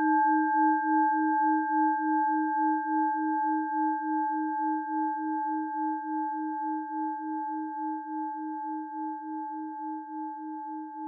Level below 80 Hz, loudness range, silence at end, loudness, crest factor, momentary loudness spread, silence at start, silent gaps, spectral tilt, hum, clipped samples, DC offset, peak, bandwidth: under -90 dBFS; 9 LU; 0 s; -29 LUFS; 14 dB; 12 LU; 0 s; none; 5 dB/octave; none; under 0.1%; under 0.1%; -16 dBFS; 1.7 kHz